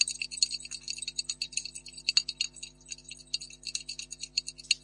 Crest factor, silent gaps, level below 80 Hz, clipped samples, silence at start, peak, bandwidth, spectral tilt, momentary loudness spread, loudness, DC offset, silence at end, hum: 28 dB; none; -64 dBFS; under 0.1%; 0 s; -6 dBFS; 11.5 kHz; 2.5 dB/octave; 15 LU; -32 LUFS; under 0.1%; 0 s; none